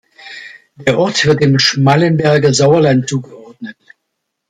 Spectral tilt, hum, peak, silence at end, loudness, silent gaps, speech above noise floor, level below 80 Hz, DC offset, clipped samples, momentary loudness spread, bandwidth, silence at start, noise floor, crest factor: -5 dB/octave; none; 0 dBFS; 0.8 s; -12 LUFS; none; 62 dB; -50 dBFS; under 0.1%; under 0.1%; 21 LU; 9.4 kHz; 0.25 s; -73 dBFS; 14 dB